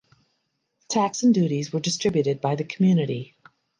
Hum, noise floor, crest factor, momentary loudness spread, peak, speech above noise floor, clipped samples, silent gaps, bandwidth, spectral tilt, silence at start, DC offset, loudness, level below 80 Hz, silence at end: none; -75 dBFS; 16 dB; 8 LU; -8 dBFS; 52 dB; under 0.1%; none; 10 kHz; -5.5 dB/octave; 0.9 s; under 0.1%; -23 LUFS; -66 dBFS; 0.55 s